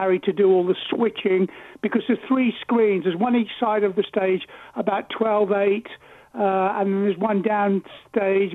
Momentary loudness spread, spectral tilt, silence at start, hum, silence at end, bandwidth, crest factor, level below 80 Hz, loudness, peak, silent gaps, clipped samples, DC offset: 8 LU; -8.5 dB/octave; 0 s; none; 0 s; 4 kHz; 14 dB; -68 dBFS; -22 LUFS; -8 dBFS; none; under 0.1%; under 0.1%